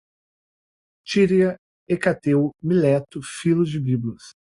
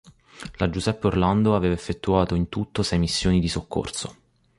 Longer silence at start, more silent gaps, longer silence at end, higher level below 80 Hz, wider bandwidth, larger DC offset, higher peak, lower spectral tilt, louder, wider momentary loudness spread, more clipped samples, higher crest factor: first, 1.05 s vs 0.35 s; first, 1.58-1.86 s vs none; second, 0.3 s vs 0.45 s; second, -58 dBFS vs -38 dBFS; about the same, 11.5 kHz vs 11.5 kHz; neither; about the same, -4 dBFS vs -6 dBFS; about the same, -7 dB/octave vs -6 dB/octave; first, -21 LUFS vs -24 LUFS; about the same, 9 LU vs 11 LU; neither; about the same, 18 dB vs 18 dB